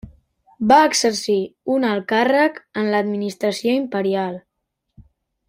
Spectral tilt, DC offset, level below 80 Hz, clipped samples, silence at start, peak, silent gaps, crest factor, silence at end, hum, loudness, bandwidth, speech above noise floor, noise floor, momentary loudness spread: -4 dB/octave; under 0.1%; -56 dBFS; under 0.1%; 0.05 s; -2 dBFS; none; 18 dB; 0.5 s; none; -19 LUFS; 16 kHz; 58 dB; -77 dBFS; 10 LU